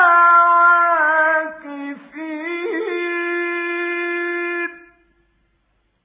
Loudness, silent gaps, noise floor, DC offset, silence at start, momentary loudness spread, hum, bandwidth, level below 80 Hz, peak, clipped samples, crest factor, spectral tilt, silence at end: -17 LUFS; none; -65 dBFS; under 0.1%; 0 s; 19 LU; none; 4 kHz; -72 dBFS; -2 dBFS; under 0.1%; 16 dB; -5.5 dB/octave; 1.25 s